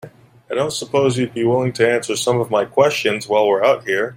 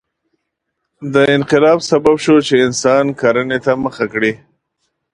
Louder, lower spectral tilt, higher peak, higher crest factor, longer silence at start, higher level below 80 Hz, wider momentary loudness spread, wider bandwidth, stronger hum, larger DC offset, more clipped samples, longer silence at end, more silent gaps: second, -17 LUFS vs -13 LUFS; about the same, -4.5 dB/octave vs -5 dB/octave; about the same, -2 dBFS vs 0 dBFS; about the same, 16 dB vs 14 dB; second, 0.05 s vs 1 s; second, -58 dBFS vs -52 dBFS; about the same, 5 LU vs 7 LU; first, 16 kHz vs 10.5 kHz; neither; neither; neither; second, 0 s vs 0.75 s; neither